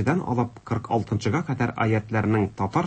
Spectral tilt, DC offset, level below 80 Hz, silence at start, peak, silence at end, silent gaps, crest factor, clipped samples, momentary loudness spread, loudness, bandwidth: -7.5 dB/octave; under 0.1%; -52 dBFS; 0 s; -10 dBFS; 0 s; none; 14 dB; under 0.1%; 4 LU; -25 LUFS; 8.6 kHz